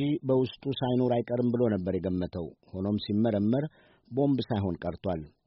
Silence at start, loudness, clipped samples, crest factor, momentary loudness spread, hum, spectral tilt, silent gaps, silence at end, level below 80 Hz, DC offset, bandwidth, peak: 0 s; -29 LUFS; under 0.1%; 14 dB; 9 LU; none; -7.5 dB/octave; none; 0.2 s; -58 dBFS; under 0.1%; 5.8 kHz; -14 dBFS